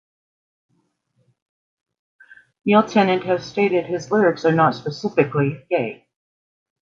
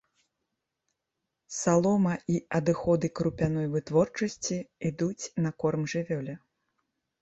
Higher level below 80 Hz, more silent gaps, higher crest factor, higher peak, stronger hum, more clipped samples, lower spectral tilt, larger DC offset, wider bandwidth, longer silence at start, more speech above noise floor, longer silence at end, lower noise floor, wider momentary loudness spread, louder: second, -64 dBFS vs -58 dBFS; neither; about the same, 20 dB vs 18 dB; first, -2 dBFS vs -10 dBFS; neither; neither; about the same, -7 dB/octave vs -6 dB/octave; neither; second, 7.4 kHz vs 8.2 kHz; first, 2.65 s vs 1.5 s; second, 49 dB vs 57 dB; about the same, 0.9 s vs 0.85 s; second, -68 dBFS vs -85 dBFS; about the same, 7 LU vs 9 LU; first, -19 LUFS vs -29 LUFS